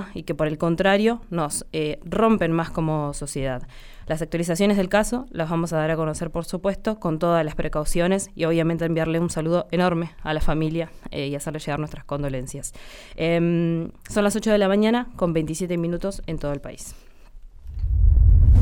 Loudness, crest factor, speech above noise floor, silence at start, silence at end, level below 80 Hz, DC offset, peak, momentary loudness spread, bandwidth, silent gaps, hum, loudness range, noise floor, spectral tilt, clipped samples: -23 LUFS; 16 dB; 19 dB; 0 s; 0 s; -28 dBFS; under 0.1%; -6 dBFS; 11 LU; 18 kHz; none; none; 4 LU; -42 dBFS; -6 dB/octave; under 0.1%